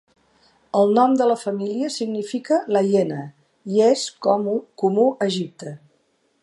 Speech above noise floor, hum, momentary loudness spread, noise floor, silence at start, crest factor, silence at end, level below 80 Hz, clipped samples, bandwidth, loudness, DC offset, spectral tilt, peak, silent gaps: 45 dB; none; 14 LU; -65 dBFS; 0.75 s; 18 dB; 0.65 s; -76 dBFS; under 0.1%; 11.5 kHz; -20 LUFS; under 0.1%; -5.5 dB/octave; -4 dBFS; none